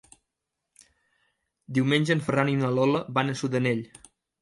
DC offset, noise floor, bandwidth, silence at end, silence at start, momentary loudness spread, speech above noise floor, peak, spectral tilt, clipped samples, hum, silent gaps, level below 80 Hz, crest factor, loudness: under 0.1%; -84 dBFS; 11.5 kHz; 0.55 s; 1.7 s; 6 LU; 59 dB; -8 dBFS; -6.5 dB/octave; under 0.1%; none; none; -66 dBFS; 20 dB; -25 LUFS